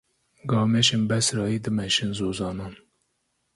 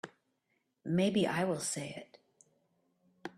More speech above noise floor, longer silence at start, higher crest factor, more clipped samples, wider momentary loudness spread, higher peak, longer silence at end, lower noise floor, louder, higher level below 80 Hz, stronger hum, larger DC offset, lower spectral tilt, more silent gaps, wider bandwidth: about the same, 50 dB vs 47 dB; first, 0.45 s vs 0.05 s; about the same, 18 dB vs 18 dB; neither; second, 14 LU vs 19 LU; first, -8 dBFS vs -18 dBFS; first, 0.8 s vs 0.05 s; second, -74 dBFS vs -80 dBFS; first, -24 LUFS vs -33 LUFS; first, -54 dBFS vs -74 dBFS; neither; neither; about the same, -4 dB/octave vs -5 dB/octave; neither; second, 11.5 kHz vs 13.5 kHz